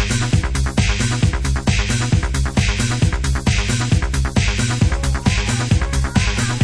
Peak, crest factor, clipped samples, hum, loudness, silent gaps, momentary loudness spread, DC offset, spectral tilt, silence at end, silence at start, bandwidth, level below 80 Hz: -2 dBFS; 16 dB; under 0.1%; none; -18 LUFS; none; 1 LU; under 0.1%; -4.5 dB/octave; 0 s; 0 s; 11 kHz; -22 dBFS